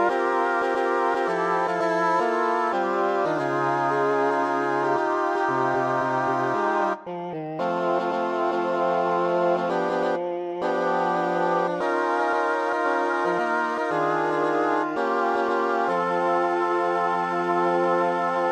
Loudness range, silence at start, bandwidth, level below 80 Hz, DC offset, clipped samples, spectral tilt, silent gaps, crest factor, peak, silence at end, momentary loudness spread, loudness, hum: 2 LU; 0 s; 9.8 kHz; -70 dBFS; under 0.1%; under 0.1%; -6 dB/octave; none; 14 dB; -10 dBFS; 0 s; 2 LU; -24 LUFS; none